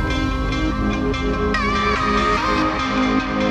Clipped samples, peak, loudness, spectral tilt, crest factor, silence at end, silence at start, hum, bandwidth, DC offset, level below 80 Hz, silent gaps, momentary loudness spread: under 0.1%; -6 dBFS; -19 LUFS; -5.5 dB/octave; 12 dB; 0 s; 0 s; none; 10 kHz; under 0.1%; -28 dBFS; none; 4 LU